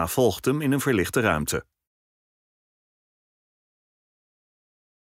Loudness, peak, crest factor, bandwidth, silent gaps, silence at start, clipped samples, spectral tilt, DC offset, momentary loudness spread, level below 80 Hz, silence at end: -24 LUFS; -10 dBFS; 18 dB; 16 kHz; none; 0 s; under 0.1%; -5 dB/octave; under 0.1%; 5 LU; -52 dBFS; 3.4 s